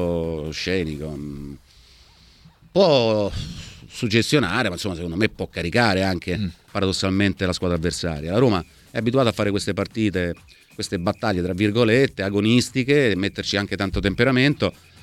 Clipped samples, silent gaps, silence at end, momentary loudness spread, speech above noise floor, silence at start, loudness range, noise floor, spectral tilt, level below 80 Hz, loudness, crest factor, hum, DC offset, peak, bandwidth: under 0.1%; none; 0.3 s; 11 LU; 30 dB; 0 s; 4 LU; -51 dBFS; -5.5 dB/octave; -42 dBFS; -22 LUFS; 20 dB; none; under 0.1%; -2 dBFS; 15.5 kHz